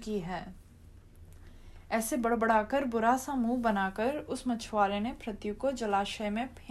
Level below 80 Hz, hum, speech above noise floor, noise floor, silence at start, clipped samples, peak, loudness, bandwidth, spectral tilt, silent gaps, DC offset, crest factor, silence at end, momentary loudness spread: -52 dBFS; none; 23 dB; -54 dBFS; 0 s; under 0.1%; -14 dBFS; -31 LUFS; 14 kHz; -4.5 dB/octave; none; under 0.1%; 18 dB; 0 s; 9 LU